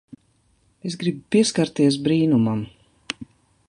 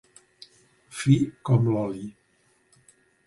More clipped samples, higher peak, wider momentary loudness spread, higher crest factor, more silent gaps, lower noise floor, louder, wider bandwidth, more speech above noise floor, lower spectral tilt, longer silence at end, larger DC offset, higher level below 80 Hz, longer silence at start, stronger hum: neither; about the same, -4 dBFS vs -6 dBFS; second, 15 LU vs 18 LU; about the same, 18 dB vs 20 dB; neither; about the same, -63 dBFS vs -66 dBFS; first, -21 LUFS vs -24 LUFS; about the same, 11.5 kHz vs 11.5 kHz; about the same, 43 dB vs 43 dB; second, -5.5 dB/octave vs -7.5 dB/octave; second, 0.45 s vs 1.15 s; neither; about the same, -58 dBFS vs -60 dBFS; about the same, 0.85 s vs 0.9 s; neither